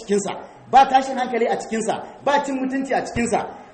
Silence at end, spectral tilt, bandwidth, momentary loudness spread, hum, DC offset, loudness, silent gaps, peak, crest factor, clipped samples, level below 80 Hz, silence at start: 0 s; -4 dB/octave; 8.8 kHz; 10 LU; none; under 0.1%; -21 LUFS; none; -2 dBFS; 18 dB; under 0.1%; -50 dBFS; 0 s